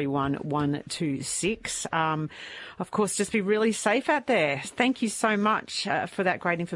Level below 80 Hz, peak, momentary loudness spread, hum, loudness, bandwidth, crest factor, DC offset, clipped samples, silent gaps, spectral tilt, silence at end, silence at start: -60 dBFS; -10 dBFS; 7 LU; none; -26 LUFS; 11.5 kHz; 18 dB; under 0.1%; under 0.1%; none; -4 dB/octave; 0 s; 0 s